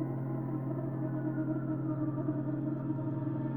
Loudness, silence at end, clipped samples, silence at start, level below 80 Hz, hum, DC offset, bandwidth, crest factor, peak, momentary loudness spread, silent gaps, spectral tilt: -35 LUFS; 0 s; under 0.1%; 0 s; -60 dBFS; none; under 0.1%; 2.7 kHz; 12 dB; -22 dBFS; 2 LU; none; -12.5 dB/octave